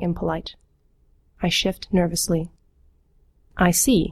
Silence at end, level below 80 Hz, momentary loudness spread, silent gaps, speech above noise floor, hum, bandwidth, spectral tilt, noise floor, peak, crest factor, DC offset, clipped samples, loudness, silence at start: 0 s; -40 dBFS; 16 LU; none; 38 dB; none; 16 kHz; -4 dB/octave; -60 dBFS; -4 dBFS; 20 dB; under 0.1%; under 0.1%; -22 LUFS; 0 s